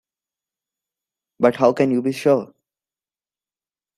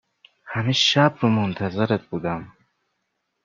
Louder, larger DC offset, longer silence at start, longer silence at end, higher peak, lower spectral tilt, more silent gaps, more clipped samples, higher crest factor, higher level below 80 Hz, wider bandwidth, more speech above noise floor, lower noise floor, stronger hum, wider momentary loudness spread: about the same, -19 LUFS vs -21 LUFS; neither; first, 1.4 s vs 0.45 s; first, 1.5 s vs 0.95 s; about the same, -2 dBFS vs -2 dBFS; first, -7 dB/octave vs -5 dB/octave; neither; neither; about the same, 20 dB vs 22 dB; second, -66 dBFS vs -60 dBFS; first, 13.5 kHz vs 7.6 kHz; first, over 73 dB vs 54 dB; first, under -90 dBFS vs -76 dBFS; neither; second, 3 LU vs 12 LU